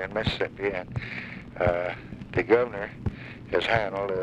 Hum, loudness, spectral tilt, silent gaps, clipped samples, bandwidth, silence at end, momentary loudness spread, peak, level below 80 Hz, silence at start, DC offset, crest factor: none; -28 LUFS; -6.5 dB/octave; none; under 0.1%; 9.6 kHz; 0 s; 12 LU; -8 dBFS; -46 dBFS; 0 s; under 0.1%; 20 dB